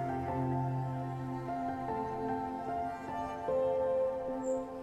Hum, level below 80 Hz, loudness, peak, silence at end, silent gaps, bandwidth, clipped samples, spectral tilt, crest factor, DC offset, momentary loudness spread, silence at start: none; -60 dBFS; -36 LUFS; -22 dBFS; 0 s; none; 11.5 kHz; under 0.1%; -8 dB/octave; 12 dB; under 0.1%; 7 LU; 0 s